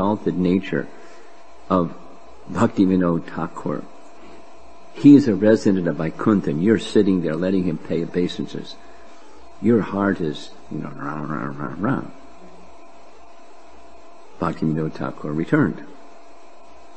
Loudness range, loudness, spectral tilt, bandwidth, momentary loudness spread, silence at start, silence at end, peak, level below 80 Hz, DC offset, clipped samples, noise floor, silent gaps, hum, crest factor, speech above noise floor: 12 LU; -21 LUFS; -7.5 dB/octave; 8.6 kHz; 15 LU; 0 s; 1.05 s; 0 dBFS; -56 dBFS; 2%; under 0.1%; -47 dBFS; none; none; 22 dB; 27 dB